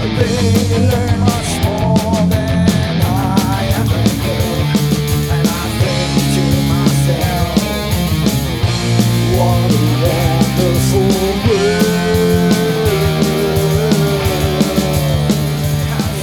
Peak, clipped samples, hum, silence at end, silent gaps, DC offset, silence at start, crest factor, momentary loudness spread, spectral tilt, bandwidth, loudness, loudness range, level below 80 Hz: 0 dBFS; under 0.1%; none; 0 s; none; under 0.1%; 0 s; 12 dB; 3 LU; -5.5 dB/octave; 19 kHz; -14 LUFS; 2 LU; -28 dBFS